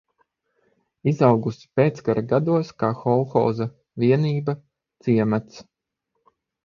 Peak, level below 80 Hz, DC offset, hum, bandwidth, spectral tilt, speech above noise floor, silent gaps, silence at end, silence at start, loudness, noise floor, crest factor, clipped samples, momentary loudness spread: -2 dBFS; -60 dBFS; under 0.1%; none; 7.2 kHz; -9 dB/octave; 57 dB; none; 1.05 s; 1.05 s; -22 LUFS; -78 dBFS; 20 dB; under 0.1%; 9 LU